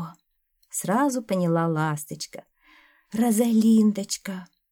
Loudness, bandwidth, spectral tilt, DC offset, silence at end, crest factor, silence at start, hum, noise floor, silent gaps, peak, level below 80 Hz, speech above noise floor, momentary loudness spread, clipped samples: -24 LUFS; 18 kHz; -5.5 dB/octave; under 0.1%; 0.25 s; 16 dB; 0 s; none; -70 dBFS; none; -10 dBFS; -70 dBFS; 47 dB; 17 LU; under 0.1%